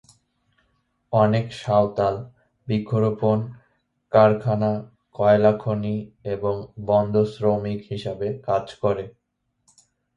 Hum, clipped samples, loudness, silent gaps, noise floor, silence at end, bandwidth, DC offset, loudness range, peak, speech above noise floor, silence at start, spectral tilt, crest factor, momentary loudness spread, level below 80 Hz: none; under 0.1%; -22 LUFS; none; -69 dBFS; 1.05 s; 10 kHz; under 0.1%; 4 LU; -2 dBFS; 48 dB; 1.1 s; -8.5 dB/octave; 22 dB; 13 LU; -54 dBFS